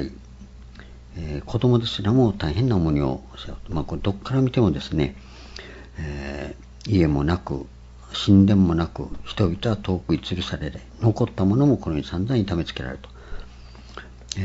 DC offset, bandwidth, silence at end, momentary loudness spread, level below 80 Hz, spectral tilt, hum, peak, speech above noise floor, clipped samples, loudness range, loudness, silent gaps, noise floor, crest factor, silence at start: under 0.1%; 8 kHz; 0 s; 21 LU; -40 dBFS; -7.5 dB/octave; none; -4 dBFS; 20 dB; under 0.1%; 5 LU; -23 LUFS; none; -42 dBFS; 20 dB; 0 s